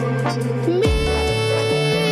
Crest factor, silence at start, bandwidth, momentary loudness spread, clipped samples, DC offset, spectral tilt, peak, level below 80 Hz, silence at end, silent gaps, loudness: 12 dB; 0 s; 14 kHz; 3 LU; under 0.1%; under 0.1%; -5.5 dB/octave; -6 dBFS; -30 dBFS; 0 s; none; -19 LUFS